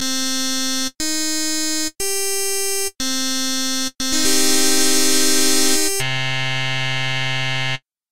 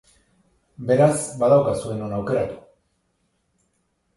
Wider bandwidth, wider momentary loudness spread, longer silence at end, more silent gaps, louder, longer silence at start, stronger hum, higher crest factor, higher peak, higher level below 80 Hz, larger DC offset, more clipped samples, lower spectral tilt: first, 17 kHz vs 11.5 kHz; second, 6 LU vs 13 LU; second, 0 s vs 1.6 s; neither; first, -18 LUFS vs -21 LUFS; second, 0 s vs 0.8 s; neither; about the same, 16 dB vs 20 dB; about the same, -2 dBFS vs -4 dBFS; first, -48 dBFS vs -54 dBFS; first, 5% vs under 0.1%; neither; second, -1.5 dB/octave vs -6.5 dB/octave